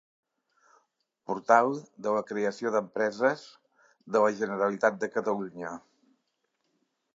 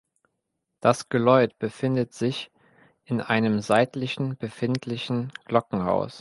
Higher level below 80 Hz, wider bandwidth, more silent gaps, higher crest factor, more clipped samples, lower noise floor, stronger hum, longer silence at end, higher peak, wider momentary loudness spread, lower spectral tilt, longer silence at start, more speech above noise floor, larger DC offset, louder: second, -80 dBFS vs -62 dBFS; second, 7.8 kHz vs 11.5 kHz; neither; about the same, 24 dB vs 20 dB; neither; about the same, -78 dBFS vs -80 dBFS; neither; first, 1.35 s vs 0 s; about the same, -6 dBFS vs -4 dBFS; first, 15 LU vs 10 LU; about the same, -5.5 dB/octave vs -6.5 dB/octave; first, 1.3 s vs 0.85 s; second, 50 dB vs 56 dB; neither; second, -28 LUFS vs -25 LUFS